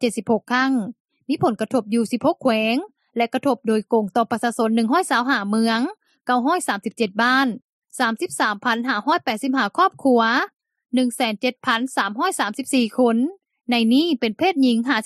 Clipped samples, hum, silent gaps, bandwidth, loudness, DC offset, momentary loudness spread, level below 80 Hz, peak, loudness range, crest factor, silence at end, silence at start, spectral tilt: under 0.1%; none; 1.00-1.08 s, 7.62-7.82 s; 13.5 kHz; -20 LUFS; under 0.1%; 7 LU; -74 dBFS; -4 dBFS; 1 LU; 16 dB; 0 s; 0 s; -4 dB/octave